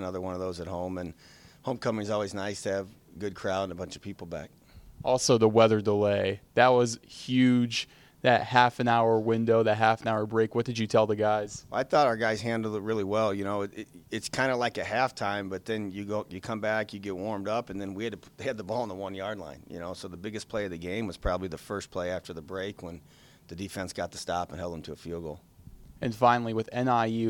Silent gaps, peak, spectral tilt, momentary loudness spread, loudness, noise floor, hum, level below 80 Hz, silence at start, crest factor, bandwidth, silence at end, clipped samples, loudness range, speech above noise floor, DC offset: none; -4 dBFS; -5 dB/octave; 16 LU; -29 LUFS; -51 dBFS; none; -56 dBFS; 0 s; 24 dB; 17 kHz; 0 s; under 0.1%; 11 LU; 22 dB; under 0.1%